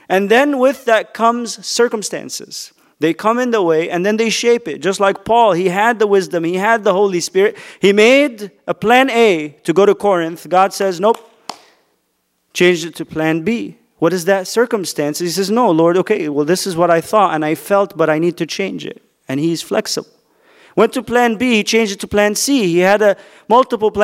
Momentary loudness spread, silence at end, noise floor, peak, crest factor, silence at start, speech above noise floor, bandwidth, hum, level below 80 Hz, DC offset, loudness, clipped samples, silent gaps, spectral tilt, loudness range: 10 LU; 0 s; -66 dBFS; 0 dBFS; 14 dB; 0.1 s; 51 dB; 16 kHz; none; -56 dBFS; under 0.1%; -15 LUFS; under 0.1%; none; -4 dB/octave; 5 LU